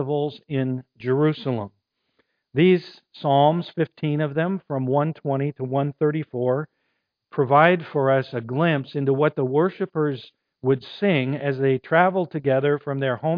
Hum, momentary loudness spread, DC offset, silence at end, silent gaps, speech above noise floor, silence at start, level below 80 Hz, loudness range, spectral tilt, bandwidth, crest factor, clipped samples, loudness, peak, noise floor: none; 9 LU; under 0.1%; 0 s; none; 53 dB; 0 s; -70 dBFS; 3 LU; -10 dB/octave; 5.2 kHz; 22 dB; under 0.1%; -22 LUFS; -2 dBFS; -75 dBFS